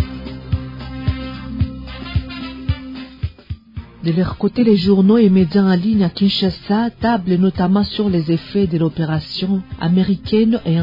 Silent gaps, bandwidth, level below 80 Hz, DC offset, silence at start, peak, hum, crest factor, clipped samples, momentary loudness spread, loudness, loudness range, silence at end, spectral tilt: none; 5.4 kHz; -36 dBFS; under 0.1%; 0 s; -2 dBFS; none; 14 dB; under 0.1%; 16 LU; -17 LUFS; 10 LU; 0 s; -9.5 dB/octave